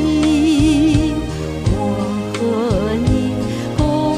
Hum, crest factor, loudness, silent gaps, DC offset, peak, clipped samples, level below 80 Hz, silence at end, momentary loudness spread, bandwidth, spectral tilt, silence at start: none; 14 dB; -17 LUFS; none; under 0.1%; -2 dBFS; under 0.1%; -28 dBFS; 0 s; 8 LU; 12.5 kHz; -6.5 dB/octave; 0 s